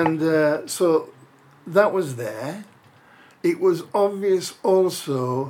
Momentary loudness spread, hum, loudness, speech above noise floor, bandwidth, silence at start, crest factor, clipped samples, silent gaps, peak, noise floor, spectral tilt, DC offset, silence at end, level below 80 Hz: 10 LU; none; -22 LUFS; 31 dB; 16.5 kHz; 0 s; 20 dB; under 0.1%; none; -2 dBFS; -52 dBFS; -5.5 dB/octave; under 0.1%; 0 s; -78 dBFS